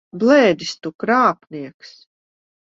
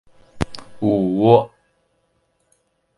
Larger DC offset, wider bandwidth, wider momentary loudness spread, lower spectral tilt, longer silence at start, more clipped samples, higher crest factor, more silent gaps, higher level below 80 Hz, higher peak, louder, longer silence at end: neither; second, 7.8 kHz vs 11.5 kHz; first, 20 LU vs 14 LU; second, -5 dB/octave vs -8 dB/octave; second, 0.15 s vs 0.35 s; neither; about the same, 18 dB vs 22 dB; first, 0.95-0.99 s, 1.74-1.80 s vs none; second, -64 dBFS vs -44 dBFS; about the same, -2 dBFS vs 0 dBFS; about the same, -16 LUFS vs -18 LUFS; second, 0.8 s vs 1.5 s